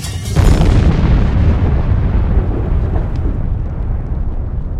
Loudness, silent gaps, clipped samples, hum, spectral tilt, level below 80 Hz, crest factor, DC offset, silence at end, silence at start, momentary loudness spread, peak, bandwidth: -16 LUFS; none; under 0.1%; none; -7.5 dB/octave; -16 dBFS; 12 dB; under 0.1%; 0 s; 0 s; 9 LU; 0 dBFS; 13 kHz